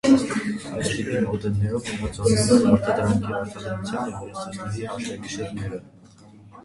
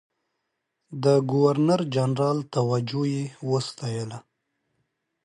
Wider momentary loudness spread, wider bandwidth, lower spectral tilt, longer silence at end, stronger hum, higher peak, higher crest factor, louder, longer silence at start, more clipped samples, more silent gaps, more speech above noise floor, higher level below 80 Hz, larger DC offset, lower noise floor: about the same, 14 LU vs 12 LU; about the same, 11.5 kHz vs 11 kHz; second, -5.5 dB/octave vs -7 dB/octave; second, 0.05 s vs 1.05 s; neither; first, -4 dBFS vs -8 dBFS; about the same, 20 dB vs 18 dB; about the same, -24 LUFS vs -24 LUFS; second, 0.05 s vs 0.9 s; neither; neither; second, 25 dB vs 56 dB; first, -46 dBFS vs -70 dBFS; neither; second, -49 dBFS vs -79 dBFS